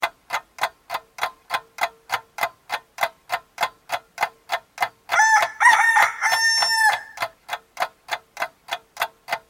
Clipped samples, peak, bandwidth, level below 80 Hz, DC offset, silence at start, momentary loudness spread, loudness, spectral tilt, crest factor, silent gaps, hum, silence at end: under 0.1%; -2 dBFS; 17 kHz; -68 dBFS; under 0.1%; 0 s; 16 LU; -22 LUFS; 1.5 dB/octave; 20 dB; none; none; 0.1 s